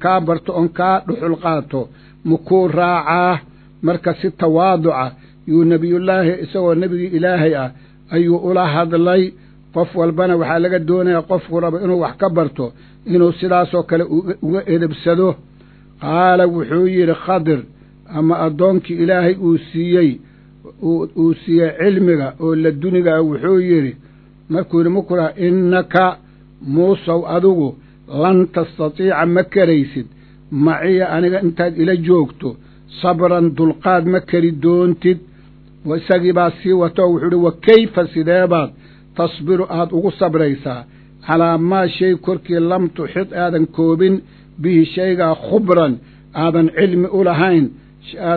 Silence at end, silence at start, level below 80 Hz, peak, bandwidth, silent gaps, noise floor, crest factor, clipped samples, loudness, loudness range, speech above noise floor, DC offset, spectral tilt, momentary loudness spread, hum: 0 s; 0 s; -50 dBFS; 0 dBFS; 4.6 kHz; none; -44 dBFS; 16 dB; under 0.1%; -15 LUFS; 2 LU; 29 dB; under 0.1%; -11 dB/octave; 9 LU; none